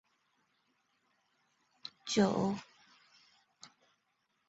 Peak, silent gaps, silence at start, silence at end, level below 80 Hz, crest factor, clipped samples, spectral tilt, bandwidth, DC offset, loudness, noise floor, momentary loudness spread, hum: -16 dBFS; none; 1.85 s; 0.8 s; -74 dBFS; 24 dB; under 0.1%; -5 dB/octave; 7.6 kHz; under 0.1%; -34 LUFS; -80 dBFS; 20 LU; none